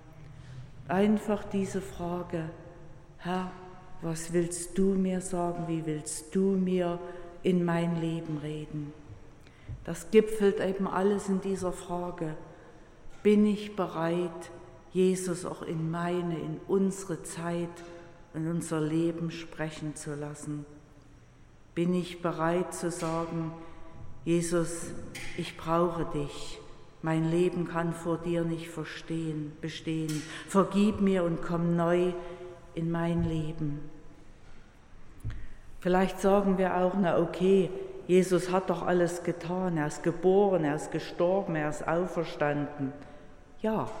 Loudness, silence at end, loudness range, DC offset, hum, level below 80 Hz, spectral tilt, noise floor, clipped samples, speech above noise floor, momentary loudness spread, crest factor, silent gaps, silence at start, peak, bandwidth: -30 LUFS; 0 s; 6 LU; under 0.1%; none; -50 dBFS; -6.5 dB/octave; -54 dBFS; under 0.1%; 25 dB; 17 LU; 22 dB; none; 0 s; -10 dBFS; 16 kHz